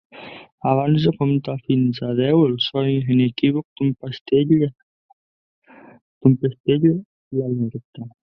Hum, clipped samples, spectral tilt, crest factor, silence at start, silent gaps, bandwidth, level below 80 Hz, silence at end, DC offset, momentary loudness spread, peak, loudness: none; under 0.1%; -10 dB/octave; 18 dB; 0.15 s; 0.52-0.58 s, 3.65-3.76 s, 4.21-4.25 s, 4.83-5.62 s, 6.01-6.21 s, 6.60-6.64 s, 7.05-7.31 s, 7.84-7.93 s; 5.8 kHz; -58 dBFS; 0.3 s; under 0.1%; 12 LU; -2 dBFS; -20 LUFS